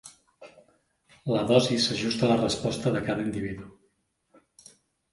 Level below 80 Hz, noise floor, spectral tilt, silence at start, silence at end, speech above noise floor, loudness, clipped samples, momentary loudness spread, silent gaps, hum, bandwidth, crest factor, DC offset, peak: -56 dBFS; -72 dBFS; -5 dB/octave; 0.05 s; 1.4 s; 46 dB; -26 LUFS; under 0.1%; 13 LU; none; none; 11.5 kHz; 24 dB; under 0.1%; -4 dBFS